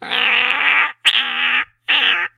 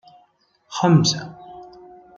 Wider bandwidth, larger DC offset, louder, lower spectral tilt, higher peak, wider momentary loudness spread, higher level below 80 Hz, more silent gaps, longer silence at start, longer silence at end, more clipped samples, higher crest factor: first, 16.5 kHz vs 7.6 kHz; neither; first, -14 LUFS vs -18 LUFS; second, 0.5 dB/octave vs -5 dB/octave; about the same, 0 dBFS vs -2 dBFS; second, 3 LU vs 25 LU; about the same, -66 dBFS vs -62 dBFS; neither; second, 0 s vs 0.7 s; second, 0.1 s vs 0.5 s; neither; about the same, 18 dB vs 20 dB